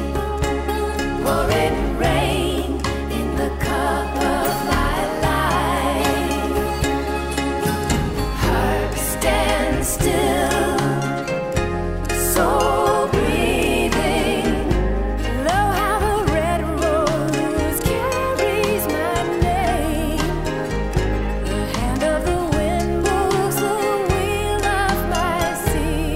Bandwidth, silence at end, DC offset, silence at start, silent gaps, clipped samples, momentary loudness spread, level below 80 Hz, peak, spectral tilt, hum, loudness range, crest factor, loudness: 16 kHz; 0 s; under 0.1%; 0 s; none; under 0.1%; 4 LU; -28 dBFS; -4 dBFS; -5 dB/octave; none; 2 LU; 16 dB; -20 LUFS